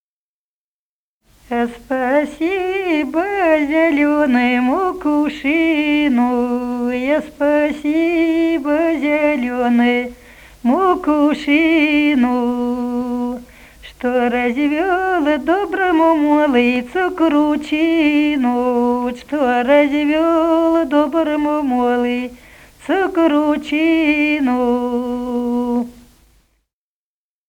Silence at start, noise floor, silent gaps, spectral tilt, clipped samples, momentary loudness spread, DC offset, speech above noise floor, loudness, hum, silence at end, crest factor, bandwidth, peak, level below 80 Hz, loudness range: 1.5 s; under -90 dBFS; none; -5 dB/octave; under 0.1%; 7 LU; under 0.1%; over 75 dB; -16 LUFS; none; 1.55 s; 16 dB; 14.5 kHz; -2 dBFS; -48 dBFS; 3 LU